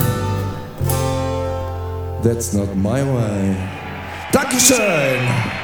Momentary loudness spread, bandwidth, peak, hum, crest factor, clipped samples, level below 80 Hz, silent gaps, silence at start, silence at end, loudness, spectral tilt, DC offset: 14 LU; over 20 kHz; 0 dBFS; none; 18 dB; under 0.1%; -38 dBFS; none; 0 s; 0 s; -18 LUFS; -4.5 dB/octave; under 0.1%